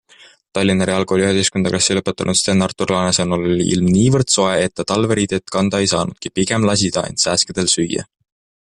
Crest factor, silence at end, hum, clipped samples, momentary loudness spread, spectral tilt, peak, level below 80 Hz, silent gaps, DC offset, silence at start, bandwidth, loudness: 16 dB; 0.7 s; none; under 0.1%; 5 LU; -4 dB/octave; -2 dBFS; -48 dBFS; none; under 0.1%; 0.55 s; 11.5 kHz; -16 LUFS